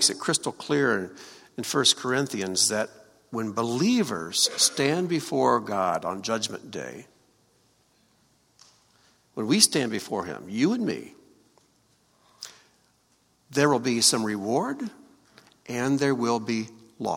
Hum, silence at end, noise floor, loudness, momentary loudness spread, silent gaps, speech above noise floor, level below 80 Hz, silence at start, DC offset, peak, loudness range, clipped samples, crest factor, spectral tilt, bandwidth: none; 0 s; -66 dBFS; -25 LUFS; 16 LU; none; 40 dB; -70 dBFS; 0 s; under 0.1%; 0 dBFS; 8 LU; under 0.1%; 26 dB; -3 dB/octave; 16.5 kHz